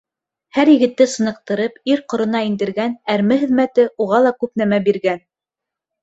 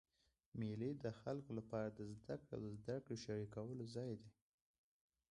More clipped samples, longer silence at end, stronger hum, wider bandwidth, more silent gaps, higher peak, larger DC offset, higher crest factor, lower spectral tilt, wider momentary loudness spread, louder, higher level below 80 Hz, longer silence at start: neither; second, 0.85 s vs 1 s; neither; second, 8.2 kHz vs 11 kHz; neither; first, 0 dBFS vs -30 dBFS; neither; about the same, 16 dB vs 18 dB; second, -5.5 dB/octave vs -7 dB/octave; first, 9 LU vs 6 LU; first, -17 LUFS vs -49 LUFS; first, -62 dBFS vs -74 dBFS; about the same, 0.55 s vs 0.55 s